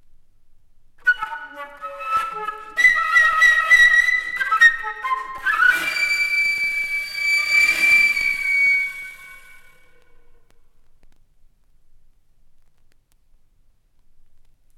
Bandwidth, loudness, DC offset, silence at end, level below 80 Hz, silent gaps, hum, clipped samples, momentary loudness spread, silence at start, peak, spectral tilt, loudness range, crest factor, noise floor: 18.5 kHz; -16 LUFS; under 0.1%; 5.2 s; -50 dBFS; none; none; under 0.1%; 16 LU; 1.05 s; -2 dBFS; 1 dB/octave; 7 LU; 18 dB; -56 dBFS